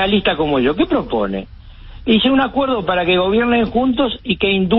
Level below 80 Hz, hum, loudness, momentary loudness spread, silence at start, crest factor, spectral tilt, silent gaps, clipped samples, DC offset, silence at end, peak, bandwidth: -36 dBFS; none; -16 LUFS; 6 LU; 0 s; 14 dB; -11 dB/octave; none; under 0.1%; under 0.1%; 0 s; -2 dBFS; 5.6 kHz